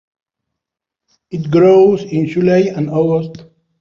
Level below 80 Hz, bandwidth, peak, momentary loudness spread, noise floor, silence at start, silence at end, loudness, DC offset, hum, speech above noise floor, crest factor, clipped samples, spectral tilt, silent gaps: -54 dBFS; 7 kHz; -2 dBFS; 15 LU; -83 dBFS; 1.3 s; 0.35 s; -13 LUFS; under 0.1%; none; 71 dB; 14 dB; under 0.1%; -8.5 dB/octave; none